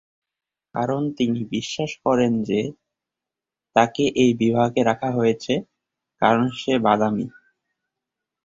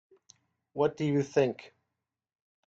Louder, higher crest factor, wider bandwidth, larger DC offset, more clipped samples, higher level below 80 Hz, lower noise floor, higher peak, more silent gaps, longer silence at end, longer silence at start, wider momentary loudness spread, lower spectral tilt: first, -21 LUFS vs -29 LUFS; about the same, 20 dB vs 20 dB; about the same, 7.8 kHz vs 7.6 kHz; neither; neither; first, -58 dBFS vs -72 dBFS; about the same, -88 dBFS vs -87 dBFS; first, -2 dBFS vs -12 dBFS; neither; first, 1.15 s vs 1 s; about the same, 0.75 s vs 0.75 s; second, 8 LU vs 15 LU; about the same, -6 dB/octave vs -7 dB/octave